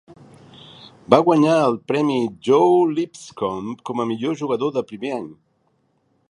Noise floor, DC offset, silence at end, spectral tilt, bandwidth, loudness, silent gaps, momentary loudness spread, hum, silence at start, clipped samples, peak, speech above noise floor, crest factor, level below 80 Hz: -65 dBFS; under 0.1%; 0.95 s; -6.5 dB/octave; 11 kHz; -20 LUFS; none; 13 LU; none; 0.1 s; under 0.1%; 0 dBFS; 46 dB; 20 dB; -64 dBFS